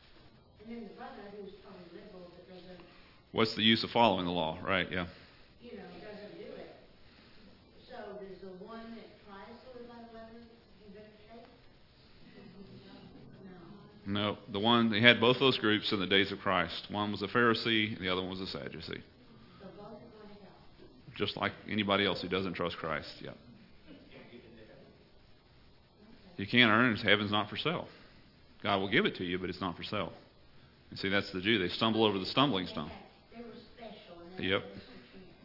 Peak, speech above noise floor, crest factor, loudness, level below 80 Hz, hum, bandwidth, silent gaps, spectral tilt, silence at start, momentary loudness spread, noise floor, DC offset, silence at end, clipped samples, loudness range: -4 dBFS; 29 dB; 32 dB; -30 LUFS; -66 dBFS; none; 5.8 kHz; none; -6.5 dB/octave; 0.6 s; 26 LU; -61 dBFS; under 0.1%; 0.15 s; under 0.1%; 21 LU